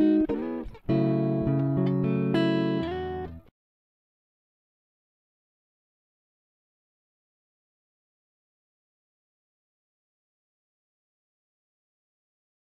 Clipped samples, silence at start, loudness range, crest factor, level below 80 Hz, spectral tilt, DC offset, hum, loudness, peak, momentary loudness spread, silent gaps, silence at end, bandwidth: under 0.1%; 0 s; 13 LU; 18 dB; -54 dBFS; -9.5 dB/octave; under 0.1%; none; -27 LUFS; -12 dBFS; 10 LU; none; 9.25 s; 5.6 kHz